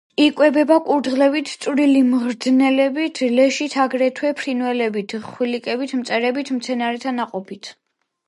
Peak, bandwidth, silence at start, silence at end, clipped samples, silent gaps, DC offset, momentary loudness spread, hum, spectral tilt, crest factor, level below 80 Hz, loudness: -2 dBFS; 11.5 kHz; 0.2 s; 0.55 s; under 0.1%; none; under 0.1%; 10 LU; none; -4 dB/octave; 16 dB; -72 dBFS; -19 LUFS